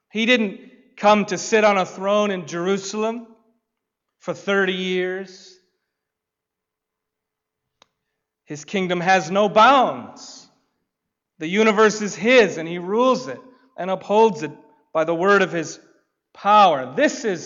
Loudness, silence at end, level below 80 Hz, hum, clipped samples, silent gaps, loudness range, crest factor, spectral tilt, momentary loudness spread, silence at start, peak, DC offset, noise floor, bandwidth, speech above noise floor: -19 LUFS; 0 s; -68 dBFS; none; under 0.1%; none; 8 LU; 16 dB; -4.5 dB/octave; 19 LU; 0.15 s; -4 dBFS; under 0.1%; -84 dBFS; 7.8 kHz; 64 dB